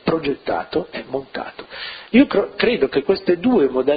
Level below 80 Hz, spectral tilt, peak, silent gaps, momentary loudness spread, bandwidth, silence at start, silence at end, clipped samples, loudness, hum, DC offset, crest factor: -50 dBFS; -10.5 dB/octave; -2 dBFS; none; 15 LU; 5 kHz; 0.05 s; 0 s; under 0.1%; -19 LUFS; none; under 0.1%; 18 dB